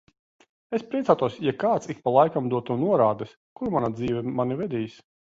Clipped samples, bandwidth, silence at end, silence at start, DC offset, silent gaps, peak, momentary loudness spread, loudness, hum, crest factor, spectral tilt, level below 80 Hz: under 0.1%; 7.8 kHz; 0.5 s; 0.7 s; under 0.1%; 3.37-3.56 s; -4 dBFS; 11 LU; -25 LUFS; none; 20 dB; -8 dB/octave; -60 dBFS